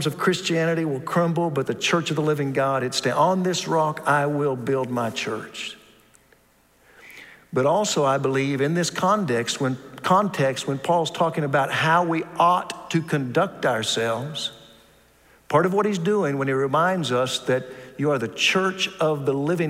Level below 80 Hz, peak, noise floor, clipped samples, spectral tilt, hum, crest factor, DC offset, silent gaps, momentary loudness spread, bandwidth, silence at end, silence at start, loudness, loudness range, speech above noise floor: -66 dBFS; -6 dBFS; -59 dBFS; under 0.1%; -4.5 dB/octave; none; 18 dB; under 0.1%; none; 7 LU; 16 kHz; 0 s; 0 s; -23 LUFS; 4 LU; 37 dB